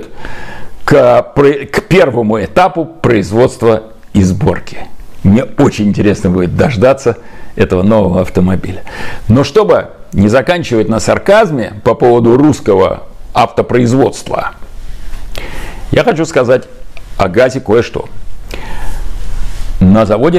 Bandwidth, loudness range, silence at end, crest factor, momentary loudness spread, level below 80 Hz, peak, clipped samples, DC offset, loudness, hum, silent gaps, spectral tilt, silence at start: 14.5 kHz; 4 LU; 0 s; 10 dB; 18 LU; -26 dBFS; 0 dBFS; under 0.1%; under 0.1%; -10 LUFS; none; none; -7 dB/octave; 0 s